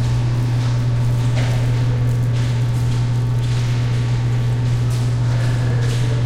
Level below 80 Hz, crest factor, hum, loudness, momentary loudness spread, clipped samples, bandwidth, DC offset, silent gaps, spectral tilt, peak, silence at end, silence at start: -30 dBFS; 8 dB; none; -18 LUFS; 1 LU; under 0.1%; 10.5 kHz; under 0.1%; none; -7 dB/octave; -8 dBFS; 0 s; 0 s